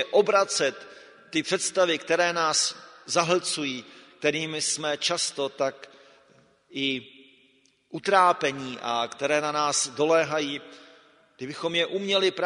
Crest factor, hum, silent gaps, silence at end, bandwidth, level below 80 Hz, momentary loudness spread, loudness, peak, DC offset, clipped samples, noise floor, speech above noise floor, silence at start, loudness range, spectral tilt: 22 dB; none; none; 0 s; 11 kHz; -74 dBFS; 11 LU; -25 LUFS; -6 dBFS; under 0.1%; under 0.1%; -63 dBFS; 38 dB; 0 s; 4 LU; -2 dB/octave